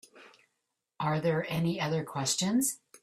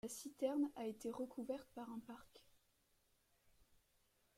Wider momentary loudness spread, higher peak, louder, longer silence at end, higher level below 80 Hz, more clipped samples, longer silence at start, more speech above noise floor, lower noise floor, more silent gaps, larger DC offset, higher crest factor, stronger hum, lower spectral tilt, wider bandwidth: second, 5 LU vs 13 LU; first, -16 dBFS vs -28 dBFS; first, -30 LUFS vs -46 LUFS; second, 0.05 s vs 0.75 s; first, -68 dBFS vs -80 dBFS; neither; about the same, 0.15 s vs 0.05 s; first, 53 dB vs 33 dB; about the same, -83 dBFS vs -80 dBFS; neither; neither; about the same, 16 dB vs 20 dB; neither; about the same, -4.5 dB/octave vs -4.5 dB/octave; about the same, 15.5 kHz vs 16 kHz